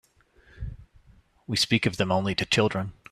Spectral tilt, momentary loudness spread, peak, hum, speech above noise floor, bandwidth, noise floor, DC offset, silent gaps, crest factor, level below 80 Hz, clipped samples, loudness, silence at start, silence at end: -4.5 dB/octave; 18 LU; -6 dBFS; none; 34 dB; 14.5 kHz; -59 dBFS; under 0.1%; none; 22 dB; -48 dBFS; under 0.1%; -25 LUFS; 0.55 s; 0.2 s